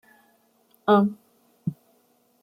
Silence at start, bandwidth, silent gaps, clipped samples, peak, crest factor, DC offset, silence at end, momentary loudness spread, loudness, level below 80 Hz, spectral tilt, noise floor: 0.85 s; 5 kHz; none; under 0.1%; -8 dBFS; 20 dB; under 0.1%; 0.7 s; 14 LU; -24 LUFS; -70 dBFS; -8.5 dB/octave; -64 dBFS